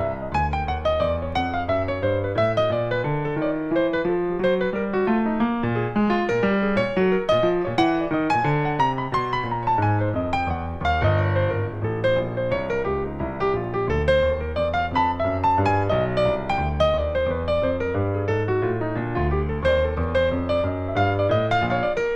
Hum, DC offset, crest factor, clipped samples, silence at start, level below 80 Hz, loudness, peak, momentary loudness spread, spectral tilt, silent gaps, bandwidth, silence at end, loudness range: none; under 0.1%; 16 dB; under 0.1%; 0 s; -36 dBFS; -23 LUFS; -6 dBFS; 4 LU; -8 dB/octave; none; 8.4 kHz; 0 s; 2 LU